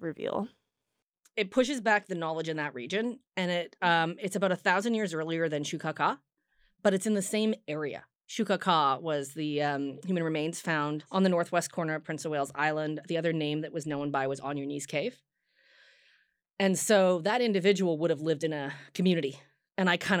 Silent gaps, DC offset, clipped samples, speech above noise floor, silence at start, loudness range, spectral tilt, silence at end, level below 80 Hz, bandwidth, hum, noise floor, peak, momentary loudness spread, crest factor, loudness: none; under 0.1%; under 0.1%; 56 dB; 0 s; 4 LU; -4.5 dB/octave; 0 s; -78 dBFS; 18.5 kHz; none; -85 dBFS; -10 dBFS; 9 LU; 20 dB; -30 LUFS